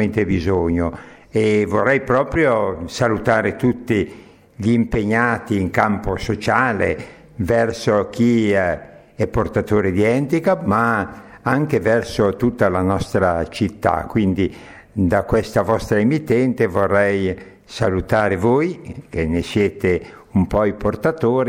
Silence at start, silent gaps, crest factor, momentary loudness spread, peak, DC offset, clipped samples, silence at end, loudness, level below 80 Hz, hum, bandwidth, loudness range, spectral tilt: 0 s; none; 18 dB; 7 LU; 0 dBFS; under 0.1%; under 0.1%; 0 s; -19 LUFS; -40 dBFS; none; 16.5 kHz; 1 LU; -7 dB/octave